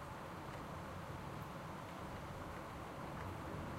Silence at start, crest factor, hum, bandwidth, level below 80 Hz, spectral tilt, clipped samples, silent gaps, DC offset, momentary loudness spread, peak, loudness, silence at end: 0 s; 12 dB; none; 16 kHz; -60 dBFS; -6 dB/octave; under 0.1%; none; under 0.1%; 2 LU; -36 dBFS; -49 LUFS; 0 s